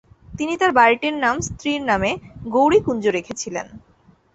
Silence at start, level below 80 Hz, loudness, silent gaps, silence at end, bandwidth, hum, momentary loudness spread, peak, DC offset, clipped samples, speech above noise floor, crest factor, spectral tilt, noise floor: 0.3 s; -46 dBFS; -19 LUFS; none; 0.55 s; 8.2 kHz; none; 14 LU; -2 dBFS; under 0.1%; under 0.1%; 36 dB; 20 dB; -4 dB/octave; -55 dBFS